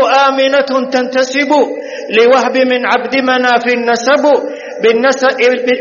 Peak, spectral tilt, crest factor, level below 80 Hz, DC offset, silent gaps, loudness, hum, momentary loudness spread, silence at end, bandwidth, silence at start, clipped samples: 0 dBFS; -0.5 dB/octave; 10 dB; -66 dBFS; under 0.1%; none; -11 LUFS; none; 5 LU; 0 s; 7.4 kHz; 0 s; under 0.1%